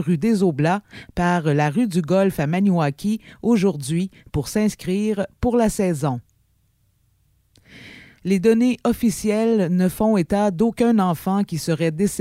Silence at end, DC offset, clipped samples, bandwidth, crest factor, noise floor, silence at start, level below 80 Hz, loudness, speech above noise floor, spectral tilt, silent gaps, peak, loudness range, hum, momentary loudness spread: 0 s; under 0.1%; under 0.1%; 16 kHz; 14 dB; -63 dBFS; 0 s; -46 dBFS; -20 LUFS; 43 dB; -6.5 dB/octave; none; -6 dBFS; 5 LU; none; 7 LU